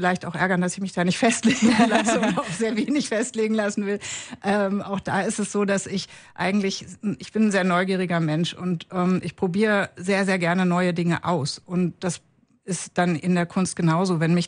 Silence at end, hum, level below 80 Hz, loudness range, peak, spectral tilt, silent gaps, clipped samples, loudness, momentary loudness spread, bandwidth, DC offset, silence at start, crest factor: 0 s; none; -60 dBFS; 4 LU; -6 dBFS; -5 dB/octave; none; under 0.1%; -23 LUFS; 9 LU; 10.5 kHz; under 0.1%; 0 s; 18 dB